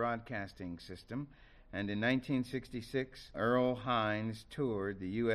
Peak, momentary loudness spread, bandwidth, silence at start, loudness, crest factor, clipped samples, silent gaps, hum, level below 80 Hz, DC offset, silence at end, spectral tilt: -20 dBFS; 12 LU; 13 kHz; 0 s; -37 LUFS; 18 dB; under 0.1%; none; none; -60 dBFS; under 0.1%; 0 s; -7 dB/octave